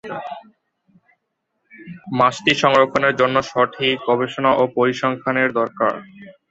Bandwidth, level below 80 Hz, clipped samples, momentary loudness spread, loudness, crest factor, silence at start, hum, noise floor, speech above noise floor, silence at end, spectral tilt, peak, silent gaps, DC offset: 8 kHz; -60 dBFS; under 0.1%; 17 LU; -18 LUFS; 20 dB; 0.05 s; none; -74 dBFS; 55 dB; 0.2 s; -5 dB/octave; 0 dBFS; none; under 0.1%